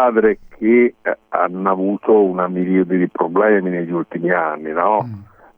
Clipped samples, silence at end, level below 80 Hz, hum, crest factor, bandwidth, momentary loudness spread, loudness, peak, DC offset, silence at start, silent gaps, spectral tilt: under 0.1%; 0.35 s; -56 dBFS; none; 16 dB; 3.5 kHz; 7 LU; -17 LUFS; 0 dBFS; under 0.1%; 0 s; none; -11 dB/octave